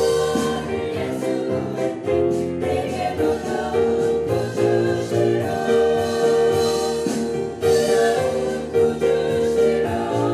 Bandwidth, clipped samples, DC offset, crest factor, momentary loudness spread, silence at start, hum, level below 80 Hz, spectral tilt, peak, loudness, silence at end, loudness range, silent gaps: 14.5 kHz; under 0.1%; under 0.1%; 14 dB; 6 LU; 0 s; none; -46 dBFS; -5.5 dB/octave; -6 dBFS; -21 LUFS; 0 s; 3 LU; none